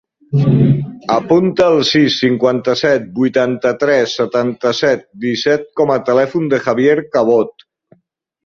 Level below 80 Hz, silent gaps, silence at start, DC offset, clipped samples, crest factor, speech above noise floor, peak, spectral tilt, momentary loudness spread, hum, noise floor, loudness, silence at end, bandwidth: -52 dBFS; none; 0.3 s; under 0.1%; under 0.1%; 14 dB; 50 dB; 0 dBFS; -6.5 dB/octave; 5 LU; none; -63 dBFS; -14 LUFS; 0.95 s; 7.6 kHz